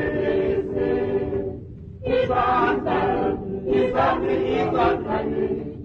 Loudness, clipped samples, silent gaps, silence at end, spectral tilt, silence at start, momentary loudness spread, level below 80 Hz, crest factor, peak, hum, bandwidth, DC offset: -22 LUFS; under 0.1%; none; 0 s; -8.5 dB/octave; 0 s; 8 LU; -42 dBFS; 16 dB; -6 dBFS; none; 6.4 kHz; under 0.1%